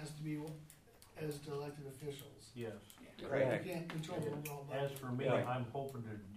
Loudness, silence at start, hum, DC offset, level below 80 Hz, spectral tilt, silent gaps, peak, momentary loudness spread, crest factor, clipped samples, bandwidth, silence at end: -42 LUFS; 0 s; none; under 0.1%; -72 dBFS; -6 dB/octave; none; -24 dBFS; 18 LU; 20 dB; under 0.1%; 15.5 kHz; 0 s